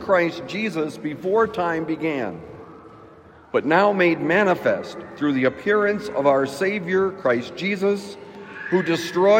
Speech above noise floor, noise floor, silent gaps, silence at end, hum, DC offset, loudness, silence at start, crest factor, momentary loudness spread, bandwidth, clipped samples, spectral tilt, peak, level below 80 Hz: 26 dB; -47 dBFS; none; 0 s; none; under 0.1%; -22 LUFS; 0 s; 16 dB; 12 LU; 16 kHz; under 0.1%; -6 dB/octave; -4 dBFS; -62 dBFS